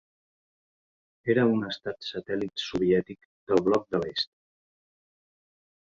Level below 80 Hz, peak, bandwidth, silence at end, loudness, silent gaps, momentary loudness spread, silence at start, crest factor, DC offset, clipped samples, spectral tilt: -62 dBFS; -8 dBFS; 7.6 kHz; 1.6 s; -28 LUFS; 3.25-3.47 s; 11 LU; 1.25 s; 22 dB; under 0.1%; under 0.1%; -6 dB/octave